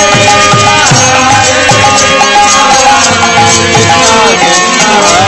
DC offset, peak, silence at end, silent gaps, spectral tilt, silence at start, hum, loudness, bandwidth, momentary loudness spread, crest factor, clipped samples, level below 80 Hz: under 0.1%; 0 dBFS; 0 s; none; -2 dB/octave; 0 s; none; -4 LUFS; 11 kHz; 1 LU; 4 dB; 8%; -34 dBFS